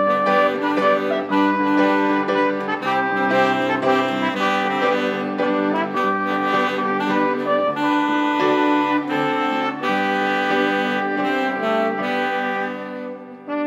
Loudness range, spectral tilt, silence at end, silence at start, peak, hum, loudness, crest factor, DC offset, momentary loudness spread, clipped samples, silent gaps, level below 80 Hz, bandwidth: 2 LU; -5.5 dB/octave; 0 s; 0 s; -4 dBFS; none; -19 LUFS; 16 dB; under 0.1%; 4 LU; under 0.1%; none; -78 dBFS; 15 kHz